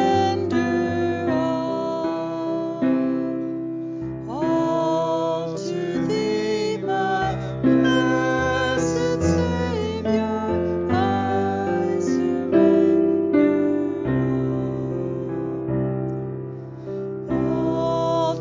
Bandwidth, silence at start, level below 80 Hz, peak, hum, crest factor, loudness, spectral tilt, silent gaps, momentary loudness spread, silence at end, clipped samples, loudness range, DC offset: 7.6 kHz; 0 s; -44 dBFS; -6 dBFS; none; 16 dB; -22 LUFS; -6.5 dB/octave; none; 9 LU; 0 s; under 0.1%; 5 LU; under 0.1%